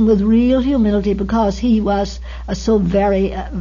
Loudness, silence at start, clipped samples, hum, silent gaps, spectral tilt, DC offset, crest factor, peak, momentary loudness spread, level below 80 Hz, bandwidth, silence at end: -16 LUFS; 0 s; under 0.1%; none; none; -7.5 dB/octave; under 0.1%; 12 dB; -4 dBFS; 9 LU; -28 dBFS; 7.4 kHz; 0 s